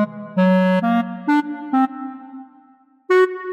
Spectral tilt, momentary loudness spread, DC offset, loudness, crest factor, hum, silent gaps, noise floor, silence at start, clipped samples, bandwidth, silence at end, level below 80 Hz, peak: -8.5 dB/octave; 17 LU; under 0.1%; -18 LUFS; 12 dB; none; none; -53 dBFS; 0 s; under 0.1%; 8.2 kHz; 0 s; -76 dBFS; -6 dBFS